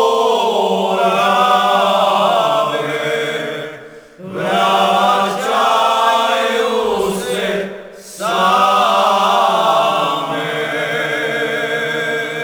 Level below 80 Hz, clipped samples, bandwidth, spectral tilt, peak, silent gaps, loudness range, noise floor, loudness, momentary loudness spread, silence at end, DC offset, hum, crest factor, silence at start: -58 dBFS; under 0.1%; over 20 kHz; -3.5 dB/octave; -2 dBFS; none; 2 LU; -36 dBFS; -15 LUFS; 10 LU; 0 s; under 0.1%; none; 14 dB; 0 s